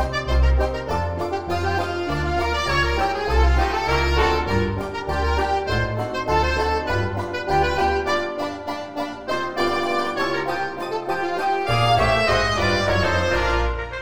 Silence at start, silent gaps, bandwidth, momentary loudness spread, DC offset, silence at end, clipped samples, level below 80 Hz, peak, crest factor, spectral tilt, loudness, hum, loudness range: 0 s; none; 15 kHz; 7 LU; 1%; 0 s; under 0.1%; -28 dBFS; -6 dBFS; 16 dB; -5.5 dB/octave; -22 LUFS; none; 3 LU